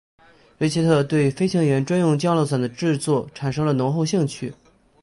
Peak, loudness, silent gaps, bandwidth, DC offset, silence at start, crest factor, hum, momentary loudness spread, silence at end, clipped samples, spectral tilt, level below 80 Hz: -6 dBFS; -21 LUFS; none; 11.5 kHz; under 0.1%; 0.6 s; 14 dB; none; 7 LU; 0.5 s; under 0.1%; -6.5 dB/octave; -56 dBFS